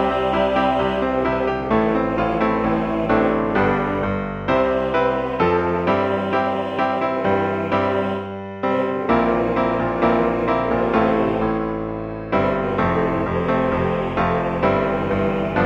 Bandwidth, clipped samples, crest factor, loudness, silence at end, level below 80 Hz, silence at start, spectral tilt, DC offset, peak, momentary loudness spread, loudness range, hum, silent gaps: 8 kHz; under 0.1%; 16 dB; -20 LUFS; 0 s; -40 dBFS; 0 s; -8 dB/octave; under 0.1%; -4 dBFS; 4 LU; 1 LU; none; none